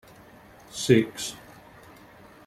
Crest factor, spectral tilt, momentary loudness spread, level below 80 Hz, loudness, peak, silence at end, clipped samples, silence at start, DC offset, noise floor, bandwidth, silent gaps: 24 dB; -5 dB/octave; 19 LU; -60 dBFS; -25 LUFS; -6 dBFS; 1.1 s; under 0.1%; 0.75 s; under 0.1%; -51 dBFS; 15.5 kHz; none